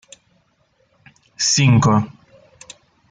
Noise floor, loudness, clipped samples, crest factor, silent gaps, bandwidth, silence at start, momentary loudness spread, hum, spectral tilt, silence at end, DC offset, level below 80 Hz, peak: -62 dBFS; -15 LUFS; under 0.1%; 18 dB; none; 9.6 kHz; 1.4 s; 8 LU; none; -4.5 dB/octave; 1 s; under 0.1%; -54 dBFS; -4 dBFS